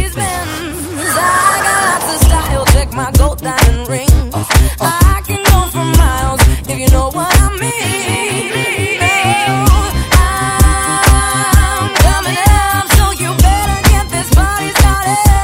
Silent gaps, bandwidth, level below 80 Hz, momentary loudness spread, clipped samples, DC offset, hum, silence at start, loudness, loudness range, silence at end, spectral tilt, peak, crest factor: none; 16.5 kHz; -14 dBFS; 5 LU; 0.5%; under 0.1%; none; 0 s; -11 LUFS; 2 LU; 0 s; -4 dB/octave; 0 dBFS; 10 dB